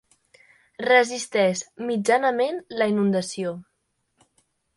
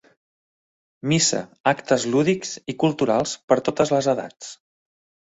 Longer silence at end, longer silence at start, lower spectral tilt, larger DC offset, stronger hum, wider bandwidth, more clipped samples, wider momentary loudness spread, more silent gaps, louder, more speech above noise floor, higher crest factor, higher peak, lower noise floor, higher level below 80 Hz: first, 1.15 s vs 0.7 s; second, 0.8 s vs 1.05 s; about the same, -4.5 dB/octave vs -4 dB/octave; neither; neither; first, 11.5 kHz vs 8.2 kHz; neither; about the same, 12 LU vs 12 LU; second, none vs 1.60-1.64 s, 3.44-3.48 s; about the same, -23 LUFS vs -22 LUFS; second, 51 dB vs over 68 dB; about the same, 18 dB vs 20 dB; second, -6 dBFS vs -2 dBFS; second, -74 dBFS vs under -90 dBFS; second, -72 dBFS vs -60 dBFS